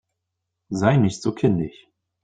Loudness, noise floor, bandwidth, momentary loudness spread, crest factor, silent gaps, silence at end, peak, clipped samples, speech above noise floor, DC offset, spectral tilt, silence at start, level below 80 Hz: -21 LUFS; -80 dBFS; 9.2 kHz; 12 LU; 20 dB; none; 0.55 s; -4 dBFS; under 0.1%; 60 dB; under 0.1%; -7 dB/octave; 0.7 s; -54 dBFS